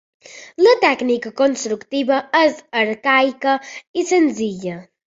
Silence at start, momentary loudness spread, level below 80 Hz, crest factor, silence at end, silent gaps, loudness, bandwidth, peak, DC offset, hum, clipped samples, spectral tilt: 0.35 s; 10 LU; -66 dBFS; 16 dB; 0.25 s; 3.87-3.94 s; -17 LUFS; 8 kHz; -2 dBFS; under 0.1%; none; under 0.1%; -3.5 dB/octave